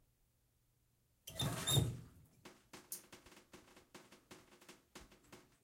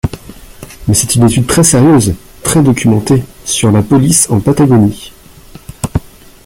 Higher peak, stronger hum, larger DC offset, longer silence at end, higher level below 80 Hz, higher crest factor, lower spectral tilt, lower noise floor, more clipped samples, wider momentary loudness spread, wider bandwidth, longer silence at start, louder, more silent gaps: second, -22 dBFS vs 0 dBFS; neither; neither; second, 0.25 s vs 0.4 s; second, -64 dBFS vs -32 dBFS; first, 24 dB vs 10 dB; second, -3.5 dB/octave vs -5 dB/octave; first, -78 dBFS vs -35 dBFS; neither; first, 26 LU vs 13 LU; second, 16.5 kHz vs over 20 kHz; first, 1.25 s vs 0.05 s; second, -40 LUFS vs -10 LUFS; neither